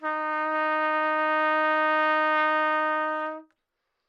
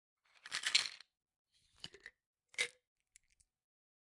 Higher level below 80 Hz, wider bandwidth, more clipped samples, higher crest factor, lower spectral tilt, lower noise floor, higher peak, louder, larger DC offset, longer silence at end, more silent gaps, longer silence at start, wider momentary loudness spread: about the same, -90 dBFS vs -86 dBFS; second, 6.8 kHz vs 11.5 kHz; neither; second, 14 dB vs 30 dB; first, -3 dB/octave vs 2 dB/octave; first, -80 dBFS vs -72 dBFS; about the same, -12 dBFS vs -14 dBFS; first, -24 LUFS vs -37 LUFS; neither; second, 0.65 s vs 1.4 s; second, none vs 1.36-1.45 s, 2.26-2.34 s; second, 0 s vs 0.45 s; second, 6 LU vs 25 LU